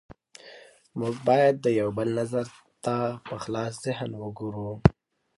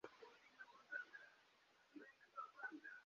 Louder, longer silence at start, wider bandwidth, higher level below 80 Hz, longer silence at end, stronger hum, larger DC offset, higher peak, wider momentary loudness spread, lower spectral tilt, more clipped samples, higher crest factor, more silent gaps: first, -27 LUFS vs -57 LUFS; first, 0.45 s vs 0.05 s; first, 11.5 kHz vs 7.2 kHz; first, -46 dBFS vs under -90 dBFS; first, 0.45 s vs 0 s; neither; neither; first, 0 dBFS vs -38 dBFS; first, 18 LU vs 12 LU; first, -7 dB/octave vs 0 dB/octave; neither; first, 26 dB vs 20 dB; neither